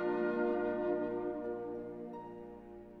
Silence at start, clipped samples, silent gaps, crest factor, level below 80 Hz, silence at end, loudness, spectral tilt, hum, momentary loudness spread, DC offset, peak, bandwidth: 0 s; under 0.1%; none; 14 dB; -66 dBFS; 0 s; -37 LUFS; -9 dB/octave; 60 Hz at -75 dBFS; 16 LU; under 0.1%; -22 dBFS; 4.9 kHz